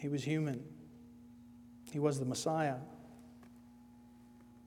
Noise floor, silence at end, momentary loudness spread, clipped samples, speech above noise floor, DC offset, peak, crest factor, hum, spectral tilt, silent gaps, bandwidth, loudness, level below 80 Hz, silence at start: -59 dBFS; 0 s; 24 LU; under 0.1%; 23 dB; under 0.1%; -20 dBFS; 20 dB; 60 Hz at -60 dBFS; -6 dB/octave; none; 16.5 kHz; -37 LUFS; -72 dBFS; 0 s